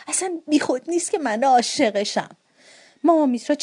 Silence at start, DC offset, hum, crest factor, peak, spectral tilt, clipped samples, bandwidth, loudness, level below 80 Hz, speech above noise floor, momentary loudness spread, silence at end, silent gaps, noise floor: 0 s; under 0.1%; none; 16 dB; -6 dBFS; -2.5 dB/octave; under 0.1%; 11 kHz; -21 LUFS; -74 dBFS; 31 dB; 6 LU; 0 s; none; -51 dBFS